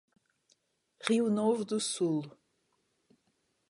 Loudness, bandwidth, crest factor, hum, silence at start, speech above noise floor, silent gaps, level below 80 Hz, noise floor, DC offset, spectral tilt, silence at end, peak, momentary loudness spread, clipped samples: -31 LUFS; 11.5 kHz; 24 dB; none; 1 s; 47 dB; none; -84 dBFS; -77 dBFS; under 0.1%; -4.5 dB/octave; 1.4 s; -12 dBFS; 9 LU; under 0.1%